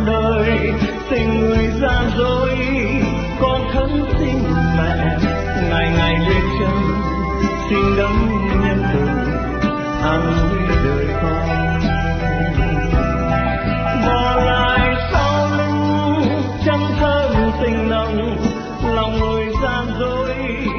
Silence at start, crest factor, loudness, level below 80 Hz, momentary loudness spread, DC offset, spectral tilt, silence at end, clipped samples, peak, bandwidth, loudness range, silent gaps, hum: 0 s; 14 dB; -17 LUFS; -24 dBFS; 4 LU; under 0.1%; -7 dB/octave; 0 s; under 0.1%; -2 dBFS; 6.6 kHz; 2 LU; none; none